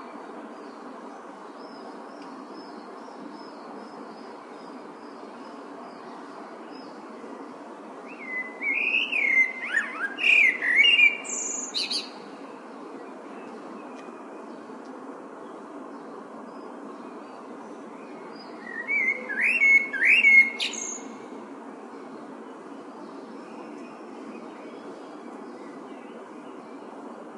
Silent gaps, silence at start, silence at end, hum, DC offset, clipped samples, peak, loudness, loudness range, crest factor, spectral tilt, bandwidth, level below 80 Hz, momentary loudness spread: none; 0 s; 0 s; none; under 0.1%; under 0.1%; -8 dBFS; -20 LUFS; 21 LU; 22 dB; -0.5 dB/octave; 11.5 kHz; under -90 dBFS; 24 LU